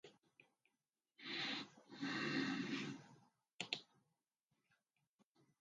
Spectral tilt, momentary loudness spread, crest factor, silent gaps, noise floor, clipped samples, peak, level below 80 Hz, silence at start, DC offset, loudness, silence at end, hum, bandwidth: -4 dB/octave; 13 LU; 26 dB; 3.53-3.59 s; under -90 dBFS; under 0.1%; -24 dBFS; under -90 dBFS; 0.05 s; under 0.1%; -45 LUFS; 1.8 s; none; 9.6 kHz